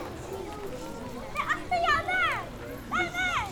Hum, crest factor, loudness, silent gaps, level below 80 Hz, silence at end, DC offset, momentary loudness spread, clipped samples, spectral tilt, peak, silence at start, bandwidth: none; 16 dB; -30 LUFS; none; -48 dBFS; 0 s; under 0.1%; 14 LU; under 0.1%; -3.5 dB/octave; -14 dBFS; 0 s; over 20 kHz